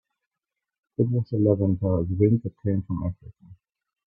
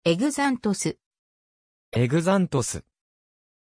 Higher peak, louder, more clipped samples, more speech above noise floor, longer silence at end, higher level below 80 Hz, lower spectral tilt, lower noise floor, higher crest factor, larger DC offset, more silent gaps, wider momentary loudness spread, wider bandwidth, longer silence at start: first, -6 dBFS vs -10 dBFS; about the same, -25 LUFS vs -24 LUFS; neither; second, 63 dB vs over 67 dB; second, 0.55 s vs 0.9 s; about the same, -52 dBFS vs -56 dBFS; first, -14.5 dB/octave vs -5.5 dB/octave; second, -86 dBFS vs under -90 dBFS; about the same, 20 dB vs 16 dB; neither; second, none vs 1.06-1.11 s, 1.19-1.92 s; about the same, 10 LU vs 9 LU; second, 4.5 kHz vs 11 kHz; first, 1 s vs 0.05 s